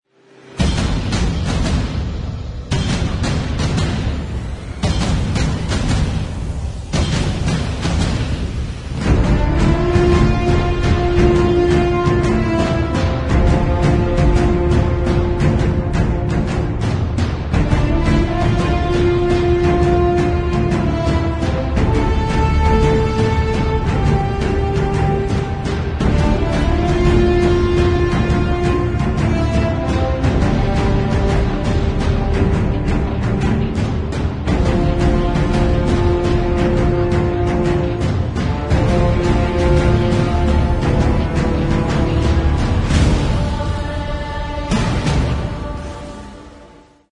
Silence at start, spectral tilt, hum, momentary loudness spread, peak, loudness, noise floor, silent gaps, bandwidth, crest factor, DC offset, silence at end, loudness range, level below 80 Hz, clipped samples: 0.45 s; -7 dB/octave; none; 7 LU; -2 dBFS; -17 LUFS; -44 dBFS; none; 10.5 kHz; 14 dB; under 0.1%; 0.45 s; 4 LU; -22 dBFS; under 0.1%